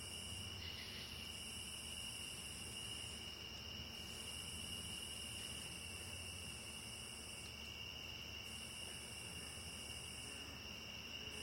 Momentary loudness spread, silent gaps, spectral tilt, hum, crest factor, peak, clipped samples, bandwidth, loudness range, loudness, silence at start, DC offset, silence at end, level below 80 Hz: 3 LU; none; -2 dB/octave; none; 14 dB; -36 dBFS; under 0.1%; 16.5 kHz; 1 LU; -48 LUFS; 0 s; under 0.1%; 0 s; -62 dBFS